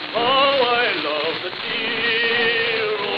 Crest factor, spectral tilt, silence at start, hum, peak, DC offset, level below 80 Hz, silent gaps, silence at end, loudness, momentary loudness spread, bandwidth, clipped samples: 16 dB; -5 dB/octave; 0 s; none; -4 dBFS; under 0.1%; -70 dBFS; none; 0 s; -19 LUFS; 7 LU; 6.8 kHz; under 0.1%